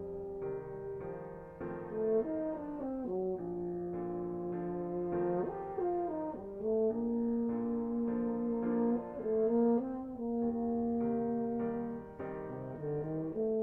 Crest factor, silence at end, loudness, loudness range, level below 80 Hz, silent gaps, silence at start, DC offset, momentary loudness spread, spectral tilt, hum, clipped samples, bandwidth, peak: 14 dB; 0 s; -36 LUFS; 4 LU; -62 dBFS; none; 0 s; under 0.1%; 10 LU; -11.5 dB/octave; none; under 0.1%; 2.8 kHz; -20 dBFS